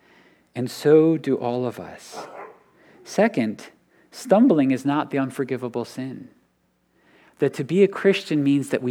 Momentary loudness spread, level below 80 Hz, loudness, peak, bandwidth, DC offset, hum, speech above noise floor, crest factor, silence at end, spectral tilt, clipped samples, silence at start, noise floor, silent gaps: 20 LU; -74 dBFS; -21 LUFS; -4 dBFS; 15 kHz; under 0.1%; none; 45 dB; 18 dB; 0 s; -6.5 dB/octave; under 0.1%; 0.55 s; -67 dBFS; none